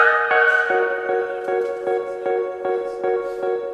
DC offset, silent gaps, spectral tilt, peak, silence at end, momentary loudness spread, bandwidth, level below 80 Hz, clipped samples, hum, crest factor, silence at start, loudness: under 0.1%; none; -4 dB/octave; -2 dBFS; 0 s; 9 LU; 9.6 kHz; -62 dBFS; under 0.1%; none; 18 dB; 0 s; -21 LUFS